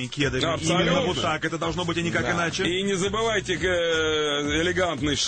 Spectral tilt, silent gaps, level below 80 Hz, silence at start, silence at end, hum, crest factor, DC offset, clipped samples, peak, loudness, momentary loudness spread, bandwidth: -4 dB/octave; none; -44 dBFS; 0 s; 0 s; none; 14 dB; under 0.1%; under 0.1%; -10 dBFS; -24 LUFS; 3 LU; 9.2 kHz